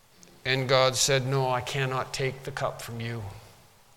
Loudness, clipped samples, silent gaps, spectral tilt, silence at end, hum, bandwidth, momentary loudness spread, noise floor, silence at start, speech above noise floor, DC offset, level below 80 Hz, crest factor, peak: -27 LUFS; under 0.1%; none; -3.5 dB/octave; 0.5 s; none; 17.5 kHz; 13 LU; -56 dBFS; 0.45 s; 28 dB; under 0.1%; -56 dBFS; 22 dB; -6 dBFS